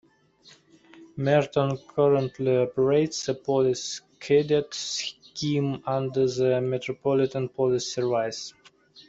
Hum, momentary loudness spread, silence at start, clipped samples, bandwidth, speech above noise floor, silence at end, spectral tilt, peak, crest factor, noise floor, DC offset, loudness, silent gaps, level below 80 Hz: none; 9 LU; 0.95 s; under 0.1%; 8 kHz; 32 dB; 0.05 s; -5.5 dB/octave; -8 dBFS; 18 dB; -57 dBFS; under 0.1%; -25 LUFS; none; -64 dBFS